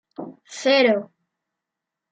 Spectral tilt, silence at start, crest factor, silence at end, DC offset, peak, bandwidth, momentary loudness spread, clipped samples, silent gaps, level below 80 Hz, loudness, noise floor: -3.5 dB/octave; 0.2 s; 18 dB; 1.05 s; under 0.1%; -6 dBFS; 9.2 kHz; 21 LU; under 0.1%; none; -82 dBFS; -19 LUFS; -85 dBFS